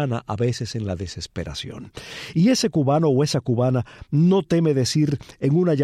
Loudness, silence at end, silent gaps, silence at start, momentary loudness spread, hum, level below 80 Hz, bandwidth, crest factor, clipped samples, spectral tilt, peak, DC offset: -21 LUFS; 0 s; none; 0 s; 13 LU; none; -50 dBFS; 13.5 kHz; 14 dB; under 0.1%; -6.5 dB/octave; -8 dBFS; under 0.1%